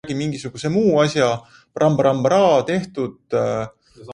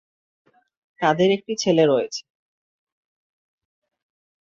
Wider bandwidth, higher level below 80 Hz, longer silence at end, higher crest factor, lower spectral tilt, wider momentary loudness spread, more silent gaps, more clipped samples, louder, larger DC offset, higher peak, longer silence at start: first, 11 kHz vs 7.8 kHz; first, -56 dBFS vs -68 dBFS; second, 0 s vs 2.2 s; about the same, 16 dB vs 20 dB; about the same, -6 dB/octave vs -5 dB/octave; about the same, 12 LU vs 10 LU; neither; neither; about the same, -19 LUFS vs -20 LUFS; neither; about the same, -4 dBFS vs -4 dBFS; second, 0.05 s vs 1 s